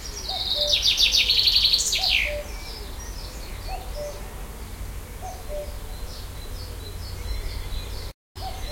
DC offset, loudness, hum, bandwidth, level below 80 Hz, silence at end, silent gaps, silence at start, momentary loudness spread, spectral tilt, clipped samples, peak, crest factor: under 0.1%; -20 LUFS; none; 16.5 kHz; -36 dBFS; 0 s; 8.14-8.35 s; 0 s; 21 LU; -1 dB/octave; under 0.1%; -6 dBFS; 22 dB